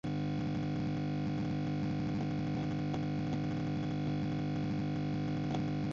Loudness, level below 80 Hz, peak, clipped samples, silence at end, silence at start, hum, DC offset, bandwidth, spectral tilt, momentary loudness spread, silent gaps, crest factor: -36 LUFS; -54 dBFS; -24 dBFS; under 0.1%; 0 s; 0.05 s; none; under 0.1%; 7.4 kHz; -7.5 dB/octave; 0 LU; none; 12 dB